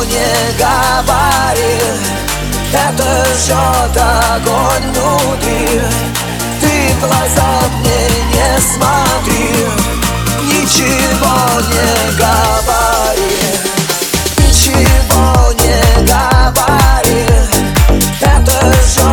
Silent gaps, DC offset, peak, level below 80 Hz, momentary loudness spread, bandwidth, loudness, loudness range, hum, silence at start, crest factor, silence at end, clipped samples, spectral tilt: none; under 0.1%; 0 dBFS; -16 dBFS; 4 LU; over 20 kHz; -10 LUFS; 3 LU; none; 0 s; 10 dB; 0 s; under 0.1%; -4 dB/octave